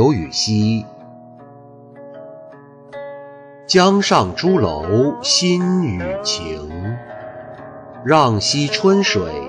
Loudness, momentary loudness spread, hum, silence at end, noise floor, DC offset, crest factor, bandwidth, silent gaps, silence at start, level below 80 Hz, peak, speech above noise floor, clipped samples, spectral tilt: -16 LUFS; 22 LU; 60 Hz at -40 dBFS; 0 s; -41 dBFS; under 0.1%; 16 dB; 11 kHz; none; 0 s; -46 dBFS; -2 dBFS; 25 dB; under 0.1%; -4.5 dB/octave